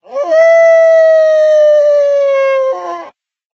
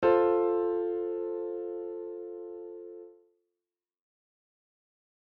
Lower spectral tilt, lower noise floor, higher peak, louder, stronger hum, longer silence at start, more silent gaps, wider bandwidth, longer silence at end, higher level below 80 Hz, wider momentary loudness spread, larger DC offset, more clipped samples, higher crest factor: second, 1.5 dB/octave vs -5 dB/octave; second, -39 dBFS vs under -90 dBFS; first, 0 dBFS vs -12 dBFS; first, -8 LUFS vs -31 LUFS; neither; about the same, 0.1 s vs 0 s; neither; first, 6.8 kHz vs 4.8 kHz; second, 0.45 s vs 2.15 s; second, -78 dBFS vs -70 dBFS; second, 11 LU vs 19 LU; neither; neither; second, 10 dB vs 20 dB